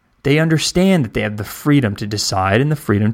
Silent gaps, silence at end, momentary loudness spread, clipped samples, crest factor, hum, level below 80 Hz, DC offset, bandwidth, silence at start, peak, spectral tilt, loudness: none; 0 s; 6 LU; under 0.1%; 14 dB; none; -42 dBFS; under 0.1%; 16.5 kHz; 0.25 s; -2 dBFS; -5.5 dB/octave; -16 LUFS